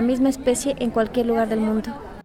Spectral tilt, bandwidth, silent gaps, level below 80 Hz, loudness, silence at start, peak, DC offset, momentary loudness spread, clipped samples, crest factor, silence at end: -5 dB/octave; 15.5 kHz; none; -44 dBFS; -22 LUFS; 0 s; -8 dBFS; under 0.1%; 4 LU; under 0.1%; 14 dB; 0.05 s